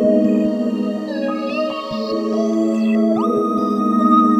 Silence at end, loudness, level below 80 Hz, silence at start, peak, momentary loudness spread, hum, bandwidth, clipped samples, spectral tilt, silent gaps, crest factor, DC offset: 0 s; -18 LUFS; -62 dBFS; 0 s; -2 dBFS; 7 LU; none; 8.6 kHz; under 0.1%; -7.5 dB/octave; none; 14 dB; under 0.1%